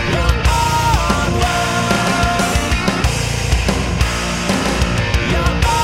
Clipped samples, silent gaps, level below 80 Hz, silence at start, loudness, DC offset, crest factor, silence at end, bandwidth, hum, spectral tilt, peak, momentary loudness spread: under 0.1%; none; -22 dBFS; 0 s; -16 LUFS; under 0.1%; 16 dB; 0 s; 16 kHz; none; -4.5 dB/octave; 0 dBFS; 3 LU